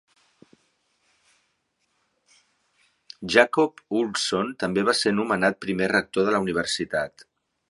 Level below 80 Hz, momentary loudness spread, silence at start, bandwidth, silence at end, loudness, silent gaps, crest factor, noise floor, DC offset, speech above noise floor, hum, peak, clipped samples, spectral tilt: -62 dBFS; 7 LU; 3.2 s; 11.5 kHz; 0.6 s; -23 LUFS; none; 26 dB; -73 dBFS; under 0.1%; 50 dB; none; 0 dBFS; under 0.1%; -4 dB/octave